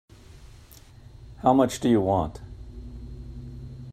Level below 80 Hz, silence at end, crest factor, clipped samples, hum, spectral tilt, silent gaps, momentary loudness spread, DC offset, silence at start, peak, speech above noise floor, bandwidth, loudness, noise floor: -44 dBFS; 0 s; 22 dB; under 0.1%; none; -6.5 dB/octave; none; 22 LU; under 0.1%; 0.35 s; -6 dBFS; 27 dB; 14.5 kHz; -23 LUFS; -49 dBFS